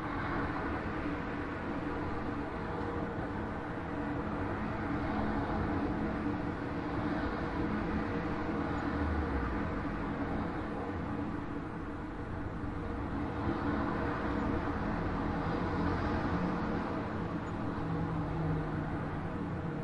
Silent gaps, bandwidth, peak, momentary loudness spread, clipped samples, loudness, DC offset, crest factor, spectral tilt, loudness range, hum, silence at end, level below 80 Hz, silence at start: none; 10.5 kHz; -20 dBFS; 4 LU; under 0.1%; -36 LUFS; under 0.1%; 16 dB; -8.5 dB/octave; 3 LU; none; 0 s; -46 dBFS; 0 s